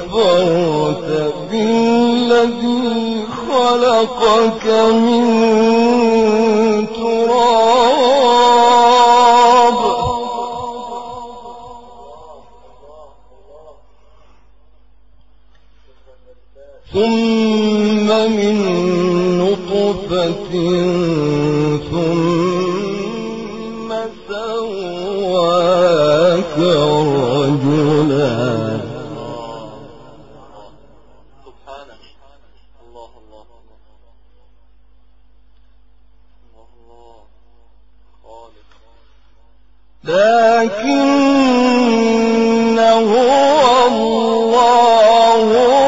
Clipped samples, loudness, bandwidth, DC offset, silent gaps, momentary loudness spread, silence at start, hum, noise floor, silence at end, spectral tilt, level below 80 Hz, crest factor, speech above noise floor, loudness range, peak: under 0.1%; -13 LUFS; 8 kHz; 0.7%; none; 14 LU; 0 s; none; -52 dBFS; 0 s; -5.5 dB/octave; -48 dBFS; 14 dB; 39 dB; 11 LU; 0 dBFS